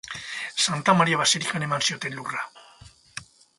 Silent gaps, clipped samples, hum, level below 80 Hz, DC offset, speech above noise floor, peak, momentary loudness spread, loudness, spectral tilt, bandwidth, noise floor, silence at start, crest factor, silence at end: none; under 0.1%; none; -62 dBFS; under 0.1%; 27 dB; -4 dBFS; 21 LU; -23 LUFS; -2.5 dB/octave; 11.5 kHz; -51 dBFS; 0.05 s; 22 dB; 0.35 s